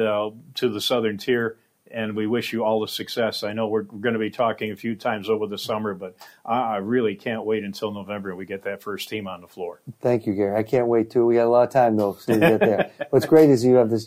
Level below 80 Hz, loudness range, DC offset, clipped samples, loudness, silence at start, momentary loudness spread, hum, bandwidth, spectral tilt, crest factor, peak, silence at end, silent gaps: -64 dBFS; 8 LU; under 0.1%; under 0.1%; -22 LUFS; 0 s; 14 LU; none; 16 kHz; -6 dB/octave; 18 dB; -4 dBFS; 0 s; none